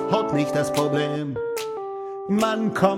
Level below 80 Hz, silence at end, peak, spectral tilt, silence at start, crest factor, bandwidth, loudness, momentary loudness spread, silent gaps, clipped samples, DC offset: -58 dBFS; 0 s; -4 dBFS; -5.5 dB/octave; 0 s; 18 dB; 16.5 kHz; -24 LUFS; 9 LU; none; under 0.1%; under 0.1%